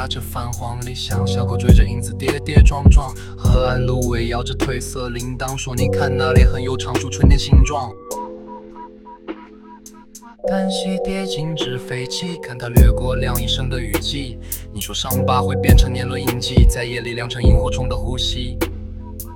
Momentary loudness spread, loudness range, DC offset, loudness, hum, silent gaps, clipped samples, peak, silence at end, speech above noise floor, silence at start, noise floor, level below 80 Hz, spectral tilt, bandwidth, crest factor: 15 LU; 7 LU; under 0.1%; -19 LUFS; none; none; under 0.1%; 0 dBFS; 0 s; 24 dB; 0 s; -41 dBFS; -20 dBFS; -5.5 dB/octave; 19 kHz; 18 dB